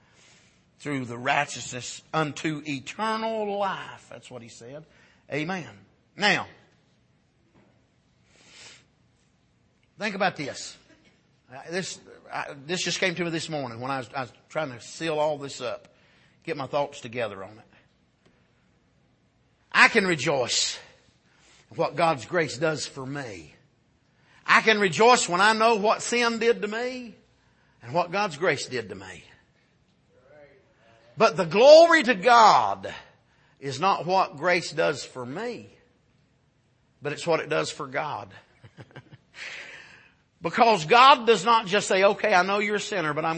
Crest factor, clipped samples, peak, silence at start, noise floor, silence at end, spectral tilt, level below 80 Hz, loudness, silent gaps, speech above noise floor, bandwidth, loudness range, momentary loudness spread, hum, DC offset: 24 dB; under 0.1%; -2 dBFS; 0.8 s; -66 dBFS; 0 s; -3.5 dB/octave; -68 dBFS; -23 LUFS; none; 42 dB; 8.8 kHz; 14 LU; 22 LU; none; under 0.1%